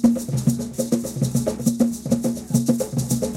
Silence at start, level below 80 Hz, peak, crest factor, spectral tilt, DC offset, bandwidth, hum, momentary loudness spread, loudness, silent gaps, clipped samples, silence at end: 0 s; -46 dBFS; -6 dBFS; 16 dB; -6.5 dB/octave; under 0.1%; 16.5 kHz; none; 3 LU; -22 LUFS; none; under 0.1%; 0 s